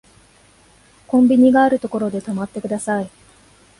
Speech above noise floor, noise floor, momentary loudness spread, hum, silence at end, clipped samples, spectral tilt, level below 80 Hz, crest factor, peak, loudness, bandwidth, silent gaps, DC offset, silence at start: 35 dB; -51 dBFS; 13 LU; none; 0.7 s; under 0.1%; -6.5 dB/octave; -56 dBFS; 16 dB; -2 dBFS; -17 LUFS; 11.5 kHz; none; under 0.1%; 1.1 s